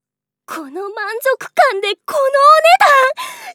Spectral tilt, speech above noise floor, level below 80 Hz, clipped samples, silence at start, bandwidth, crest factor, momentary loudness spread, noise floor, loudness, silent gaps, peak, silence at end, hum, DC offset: -0.5 dB/octave; 33 dB; -74 dBFS; under 0.1%; 0.5 s; 19.5 kHz; 14 dB; 18 LU; -46 dBFS; -12 LUFS; none; 0 dBFS; 0 s; 50 Hz at -70 dBFS; under 0.1%